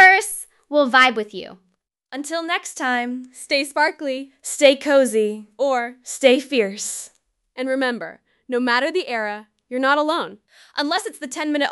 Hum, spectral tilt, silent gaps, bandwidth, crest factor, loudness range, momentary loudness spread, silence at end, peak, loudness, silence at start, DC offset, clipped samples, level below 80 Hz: none; -2 dB/octave; none; 12 kHz; 20 dB; 5 LU; 16 LU; 0 s; 0 dBFS; -20 LUFS; 0 s; under 0.1%; under 0.1%; -70 dBFS